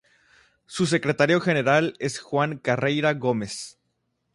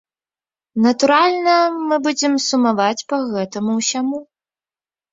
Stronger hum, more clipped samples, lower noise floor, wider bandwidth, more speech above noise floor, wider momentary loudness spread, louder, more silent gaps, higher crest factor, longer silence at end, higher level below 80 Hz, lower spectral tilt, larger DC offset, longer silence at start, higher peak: neither; neither; second, -75 dBFS vs under -90 dBFS; first, 11.5 kHz vs 7.8 kHz; second, 52 dB vs over 73 dB; first, 12 LU vs 9 LU; second, -23 LUFS vs -17 LUFS; neither; about the same, 18 dB vs 16 dB; second, 0.65 s vs 0.9 s; about the same, -64 dBFS vs -66 dBFS; first, -5 dB/octave vs -3.5 dB/octave; neither; about the same, 0.7 s vs 0.75 s; second, -6 dBFS vs -2 dBFS